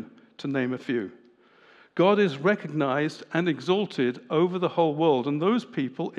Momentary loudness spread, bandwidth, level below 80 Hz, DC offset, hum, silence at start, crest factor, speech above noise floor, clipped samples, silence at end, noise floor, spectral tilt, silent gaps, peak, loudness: 9 LU; 9.6 kHz; -86 dBFS; under 0.1%; none; 0 s; 16 dB; 32 dB; under 0.1%; 0 s; -57 dBFS; -7 dB/octave; none; -10 dBFS; -25 LUFS